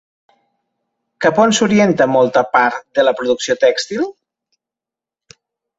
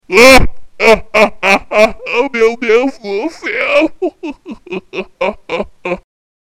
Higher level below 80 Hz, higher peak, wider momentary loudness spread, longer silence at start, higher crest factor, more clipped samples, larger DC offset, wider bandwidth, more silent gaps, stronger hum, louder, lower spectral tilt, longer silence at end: second, -58 dBFS vs -28 dBFS; about the same, 0 dBFS vs 0 dBFS; second, 7 LU vs 16 LU; first, 1.2 s vs 0.1 s; about the same, 16 dB vs 12 dB; second, under 0.1% vs 0.3%; neither; second, 8 kHz vs 17 kHz; neither; neither; second, -14 LUFS vs -11 LUFS; about the same, -4 dB/octave vs -3.5 dB/octave; first, 1.65 s vs 0.4 s